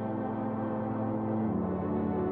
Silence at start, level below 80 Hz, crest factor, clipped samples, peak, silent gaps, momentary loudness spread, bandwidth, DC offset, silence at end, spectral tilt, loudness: 0 s; -58 dBFS; 10 dB; under 0.1%; -20 dBFS; none; 3 LU; 3.7 kHz; under 0.1%; 0 s; -12 dB/octave; -32 LUFS